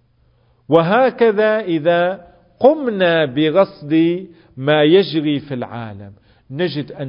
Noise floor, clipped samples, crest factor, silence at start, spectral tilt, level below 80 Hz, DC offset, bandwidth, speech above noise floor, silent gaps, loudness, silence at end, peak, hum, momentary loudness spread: -56 dBFS; under 0.1%; 16 dB; 0.7 s; -9.5 dB/octave; -58 dBFS; under 0.1%; 5.4 kHz; 41 dB; none; -16 LUFS; 0 s; 0 dBFS; none; 14 LU